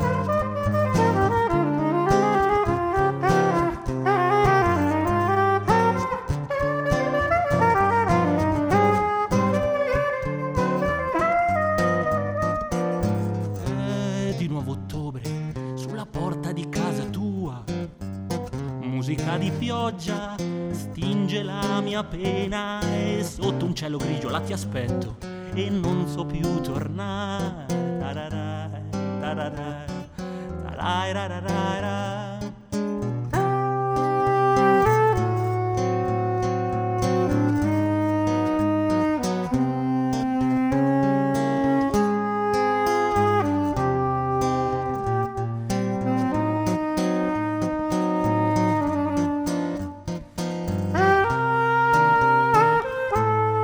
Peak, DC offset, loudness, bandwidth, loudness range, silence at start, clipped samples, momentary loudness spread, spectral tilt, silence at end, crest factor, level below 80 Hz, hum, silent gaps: -6 dBFS; under 0.1%; -23 LUFS; over 20 kHz; 8 LU; 0 s; under 0.1%; 11 LU; -6.5 dB/octave; 0 s; 18 dB; -44 dBFS; none; none